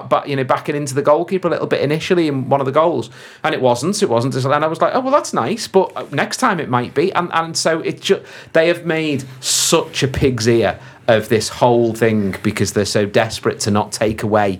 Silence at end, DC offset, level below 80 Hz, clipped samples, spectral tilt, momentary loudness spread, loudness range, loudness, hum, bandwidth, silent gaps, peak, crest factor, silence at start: 0 s; under 0.1%; -46 dBFS; under 0.1%; -4.5 dB/octave; 5 LU; 2 LU; -17 LUFS; none; 18.5 kHz; none; 0 dBFS; 16 dB; 0 s